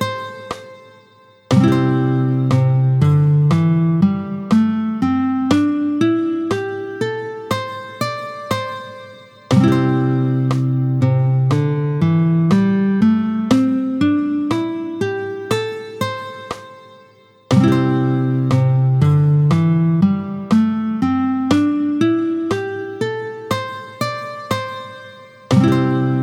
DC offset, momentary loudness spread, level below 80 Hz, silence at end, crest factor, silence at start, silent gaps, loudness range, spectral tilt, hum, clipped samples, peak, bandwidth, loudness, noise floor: under 0.1%; 12 LU; -52 dBFS; 0 s; 16 dB; 0 s; none; 6 LU; -8 dB/octave; none; under 0.1%; 0 dBFS; 13 kHz; -17 LUFS; -49 dBFS